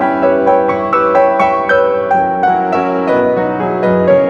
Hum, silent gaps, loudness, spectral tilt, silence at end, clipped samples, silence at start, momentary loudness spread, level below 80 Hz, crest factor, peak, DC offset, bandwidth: none; none; -12 LUFS; -8 dB/octave; 0 s; under 0.1%; 0 s; 4 LU; -48 dBFS; 12 dB; 0 dBFS; under 0.1%; 7 kHz